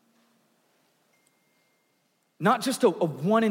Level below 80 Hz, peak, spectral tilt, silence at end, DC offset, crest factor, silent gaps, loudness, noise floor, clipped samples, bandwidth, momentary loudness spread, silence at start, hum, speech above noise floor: -88 dBFS; -10 dBFS; -5.5 dB/octave; 0 s; under 0.1%; 20 dB; none; -25 LUFS; -71 dBFS; under 0.1%; 16.5 kHz; 4 LU; 2.4 s; none; 48 dB